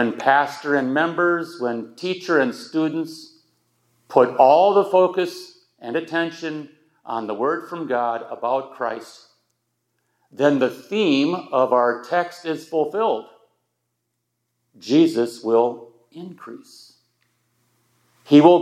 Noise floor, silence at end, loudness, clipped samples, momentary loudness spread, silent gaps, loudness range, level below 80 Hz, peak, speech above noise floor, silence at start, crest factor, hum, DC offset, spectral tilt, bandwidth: -76 dBFS; 0 s; -20 LUFS; under 0.1%; 18 LU; none; 7 LU; -82 dBFS; 0 dBFS; 56 dB; 0 s; 20 dB; none; under 0.1%; -6 dB/octave; 13.5 kHz